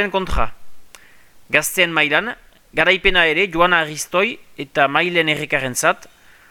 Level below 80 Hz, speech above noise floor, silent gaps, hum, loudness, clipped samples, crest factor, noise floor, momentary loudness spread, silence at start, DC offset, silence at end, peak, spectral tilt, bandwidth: -36 dBFS; 32 dB; none; none; -17 LUFS; under 0.1%; 18 dB; -50 dBFS; 11 LU; 0 s; under 0.1%; 0.45 s; 0 dBFS; -3 dB/octave; 19 kHz